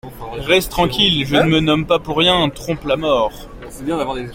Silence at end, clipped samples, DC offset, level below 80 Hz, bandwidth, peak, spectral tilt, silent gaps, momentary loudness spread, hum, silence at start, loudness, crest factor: 0 s; under 0.1%; under 0.1%; -36 dBFS; 16.5 kHz; 0 dBFS; -5 dB/octave; none; 13 LU; none; 0.05 s; -16 LUFS; 16 dB